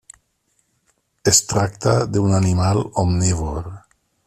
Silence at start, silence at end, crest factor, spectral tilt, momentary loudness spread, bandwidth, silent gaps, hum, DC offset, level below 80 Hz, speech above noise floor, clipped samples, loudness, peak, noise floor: 1.25 s; 0.5 s; 18 dB; -4.5 dB/octave; 10 LU; 13.5 kHz; none; none; under 0.1%; -40 dBFS; 49 dB; under 0.1%; -18 LUFS; -2 dBFS; -67 dBFS